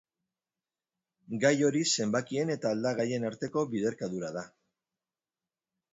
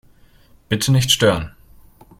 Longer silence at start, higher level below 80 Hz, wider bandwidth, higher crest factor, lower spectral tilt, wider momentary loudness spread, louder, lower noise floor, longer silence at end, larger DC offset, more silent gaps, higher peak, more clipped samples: first, 1.3 s vs 0.7 s; second, -74 dBFS vs -44 dBFS; second, 8 kHz vs 16.5 kHz; about the same, 22 dB vs 20 dB; about the same, -4.5 dB/octave vs -4 dB/octave; about the same, 12 LU vs 11 LU; second, -30 LUFS vs -17 LUFS; first, under -90 dBFS vs -50 dBFS; first, 1.45 s vs 0.7 s; neither; neither; second, -12 dBFS vs -2 dBFS; neither